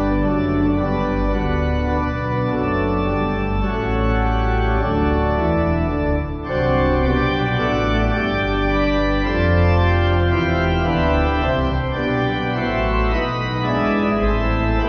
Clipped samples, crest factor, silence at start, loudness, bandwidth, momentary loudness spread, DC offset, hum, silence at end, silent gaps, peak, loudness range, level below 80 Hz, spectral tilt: under 0.1%; 14 dB; 0 s; -19 LUFS; 6.6 kHz; 4 LU; under 0.1%; none; 0 s; none; -4 dBFS; 2 LU; -24 dBFS; -8 dB/octave